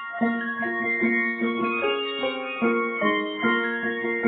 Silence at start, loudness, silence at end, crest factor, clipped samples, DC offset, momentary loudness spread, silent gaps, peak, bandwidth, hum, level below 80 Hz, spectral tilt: 0 s; -24 LUFS; 0 s; 16 dB; under 0.1%; under 0.1%; 4 LU; none; -10 dBFS; 4.5 kHz; none; -70 dBFS; -8.5 dB/octave